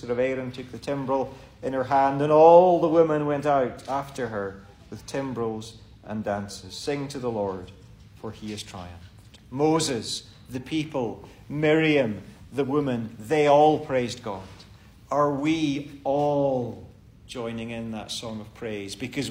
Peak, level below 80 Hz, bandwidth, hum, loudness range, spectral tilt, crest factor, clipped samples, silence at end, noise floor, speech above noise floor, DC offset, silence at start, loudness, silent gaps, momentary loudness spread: -4 dBFS; -56 dBFS; 16 kHz; none; 12 LU; -5.5 dB/octave; 22 dB; under 0.1%; 0 s; -49 dBFS; 25 dB; under 0.1%; 0 s; -24 LUFS; none; 18 LU